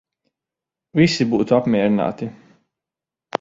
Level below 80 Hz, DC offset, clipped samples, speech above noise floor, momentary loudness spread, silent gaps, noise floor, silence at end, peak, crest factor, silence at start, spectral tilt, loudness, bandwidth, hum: -56 dBFS; under 0.1%; under 0.1%; 70 dB; 14 LU; none; -88 dBFS; 0.05 s; -2 dBFS; 20 dB; 0.95 s; -6.5 dB/octave; -18 LUFS; 7.8 kHz; none